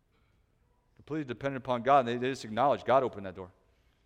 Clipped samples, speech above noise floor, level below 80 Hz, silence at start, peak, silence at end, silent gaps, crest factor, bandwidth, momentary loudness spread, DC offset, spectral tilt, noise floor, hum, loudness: under 0.1%; 40 dB; -66 dBFS; 1.1 s; -12 dBFS; 0.6 s; none; 20 dB; 10 kHz; 17 LU; under 0.1%; -6 dB/octave; -70 dBFS; none; -30 LUFS